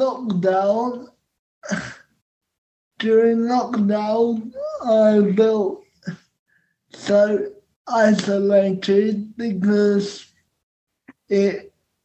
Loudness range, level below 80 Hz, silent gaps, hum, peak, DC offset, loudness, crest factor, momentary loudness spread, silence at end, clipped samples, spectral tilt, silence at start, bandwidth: 4 LU; -64 dBFS; 1.39-1.62 s, 2.22-2.41 s, 2.58-2.91 s, 6.39-6.46 s, 7.76-7.85 s, 10.63-10.87 s; none; -4 dBFS; under 0.1%; -19 LUFS; 16 dB; 16 LU; 0.4 s; under 0.1%; -6.5 dB/octave; 0 s; 8.4 kHz